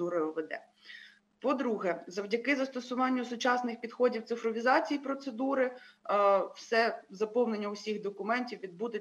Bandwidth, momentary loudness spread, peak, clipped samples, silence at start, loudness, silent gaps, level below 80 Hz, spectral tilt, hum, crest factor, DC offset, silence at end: 9.8 kHz; 11 LU; -14 dBFS; under 0.1%; 0 s; -32 LUFS; none; -90 dBFS; -4.5 dB/octave; none; 18 dB; under 0.1%; 0 s